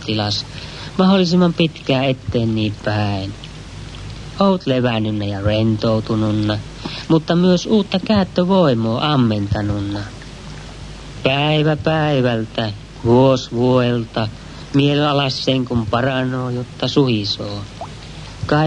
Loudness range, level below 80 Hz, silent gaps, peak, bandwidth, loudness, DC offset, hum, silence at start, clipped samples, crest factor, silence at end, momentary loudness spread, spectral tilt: 3 LU; -40 dBFS; none; -2 dBFS; 10.5 kHz; -17 LUFS; under 0.1%; none; 0 s; under 0.1%; 16 dB; 0 s; 18 LU; -6.5 dB/octave